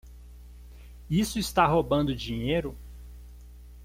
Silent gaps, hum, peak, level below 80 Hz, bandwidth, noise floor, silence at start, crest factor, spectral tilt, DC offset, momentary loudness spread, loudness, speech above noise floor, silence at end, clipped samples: none; 60 Hz at -40 dBFS; -8 dBFS; -44 dBFS; 16.5 kHz; -47 dBFS; 0.05 s; 22 dB; -5.5 dB/octave; under 0.1%; 24 LU; -27 LUFS; 21 dB; 0 s; under 0.1%